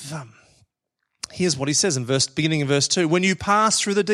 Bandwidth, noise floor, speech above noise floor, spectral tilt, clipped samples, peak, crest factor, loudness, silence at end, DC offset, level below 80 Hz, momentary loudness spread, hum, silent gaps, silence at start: 13.5 kHz; -79 dBFS; 58 dB; -3.5 dB/octave; under 0.1%; -4 dBFS; 18 dB; -20 LUFS; 0 s; under 0.1%; -58 dBFS; 16 LU; none; none; 0 s